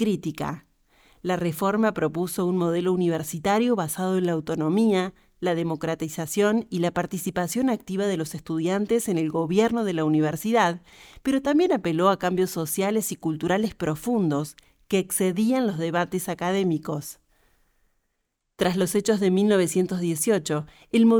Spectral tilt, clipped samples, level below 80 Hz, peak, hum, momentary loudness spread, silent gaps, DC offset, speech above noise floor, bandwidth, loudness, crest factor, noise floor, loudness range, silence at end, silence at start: -5.5 dB/octave; under 0.1%; -58 dBFS; -6 dBFS; none; 7 LU; none; under 0.1%; 53 dB; over 20 kHz; -24 LUFS; 18 dB; -77 dBFS; 3 LU; 0 s; 0 s